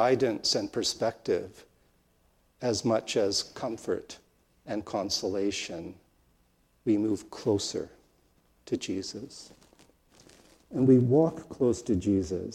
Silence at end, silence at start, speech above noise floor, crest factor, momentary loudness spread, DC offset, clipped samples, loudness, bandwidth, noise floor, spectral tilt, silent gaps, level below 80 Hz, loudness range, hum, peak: 0 s; 0 s; 39 dB; 20 dB; 14 LU; under 0.1%; under 0.1%; -29 LUFS; 14.5 kHz; -67 dBFS; -5 dB/octave; none; -62 dBFS; 6 LU; none; -10 dBFS